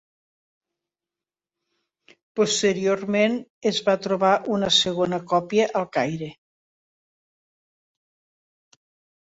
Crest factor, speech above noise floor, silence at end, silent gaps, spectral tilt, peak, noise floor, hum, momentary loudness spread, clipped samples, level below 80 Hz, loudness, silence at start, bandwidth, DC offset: 20 dB; over 68 dB; 2.9 s; 3.50-3.61 s; -4 dB/octave; -6 dBFS; under -90 dBFS; none; 7 LU; under 0.1%; -66 dBFS; -22 LUFS; 2.35 s; 8.2 kHz; under 0.1%